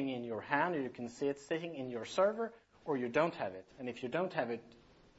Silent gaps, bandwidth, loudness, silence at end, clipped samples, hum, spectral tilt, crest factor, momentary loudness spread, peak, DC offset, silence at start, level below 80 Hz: none; 7.6 kHz; -37 LUFS; 0.45 s; under 0.1%; none; -4 dB/octave; 22 dB; 10 LU; -14 dBFS; under 0.1%; 0 s; -74 dBFS